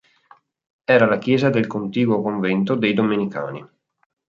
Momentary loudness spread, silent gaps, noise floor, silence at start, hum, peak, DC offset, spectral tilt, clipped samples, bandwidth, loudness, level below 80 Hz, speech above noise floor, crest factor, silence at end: 13 LU; none; -54 dBFS; 0.9 s; none; -2 dBFS; under 0.1%; -8 dB/octave; under 0.1%; 7.4 kHz; -19 LUFS; -64 dBFS; 35 dB; 18 dB; 0.6 s